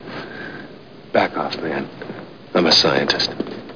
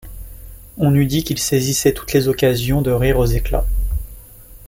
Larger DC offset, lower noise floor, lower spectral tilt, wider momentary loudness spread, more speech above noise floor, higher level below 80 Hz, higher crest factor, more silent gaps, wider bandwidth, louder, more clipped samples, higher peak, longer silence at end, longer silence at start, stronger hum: first, 0.4% vs under 0.1%; about the same, -40 dBFS vs -40 dBFS; second, -3.5 dB/octave vs -5.5 dB/octave; about the same, 21 LU vs 21 LU; about the same, 21 dB vs 24 dB; second, -56 dBFS vs -26 dBFS; about the same, 20 dB vs 16 dB; neither; second, 5.4 kHz vs 17 kHz; about the same, -18 LUFS vs -18 LUFS; neither; about the same, -2 dBFS vs -2 dBFS; about the same, 0 s vs 0 s; about the same, 0 s vs 0.05 s; neither